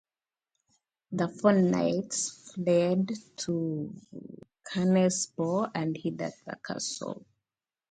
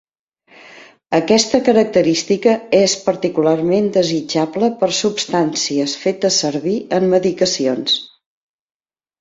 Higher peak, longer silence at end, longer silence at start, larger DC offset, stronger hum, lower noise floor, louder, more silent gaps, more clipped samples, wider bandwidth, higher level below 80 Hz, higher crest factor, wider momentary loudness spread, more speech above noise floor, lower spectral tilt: second, -10 dBFS vs 0 dBFS; second, 0.7 s vs 1.15 s; first, 1.1 s vs 0.65 s; neither; neither; first, under -90 dBFS vs -54 dBFS; second, -29 LUFS vs -16 LUFS; neither; neither; first, 9.4 kHz vs 8.2 kHz; second, -72 dBFS vs -58 dBFS; about the same, 20 dB vs 16 dB; first, 17 LU vs 5 LU; first, over 61 dB vs 38 dB; first, -5.5 dB/octave vs -4 dB/octave